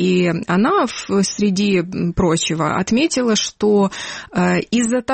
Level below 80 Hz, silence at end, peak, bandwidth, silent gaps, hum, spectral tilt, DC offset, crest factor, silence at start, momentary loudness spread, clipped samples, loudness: -42 dBFS; 0 s; -6 dBFS; 8.8 kHz; none; none; -5 dB/octave; under 0.1%; 12 dB; 0 s; 3 LU; under 0.1%; -17 LUFS